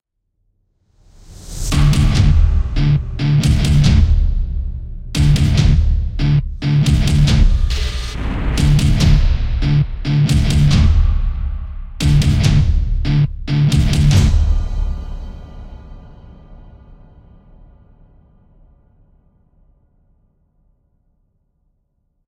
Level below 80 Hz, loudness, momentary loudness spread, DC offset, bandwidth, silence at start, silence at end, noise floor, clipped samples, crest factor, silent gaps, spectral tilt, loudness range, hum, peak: -18 dBFS; -16 LUFS; 13 LU; under 0.1%; 13.5 kHz; 1.3 s; 5.35 s; -66 dBFS; under 0.1%; 14 dB; none; -6 dB/octave; 3 LU; none; -2 dBFS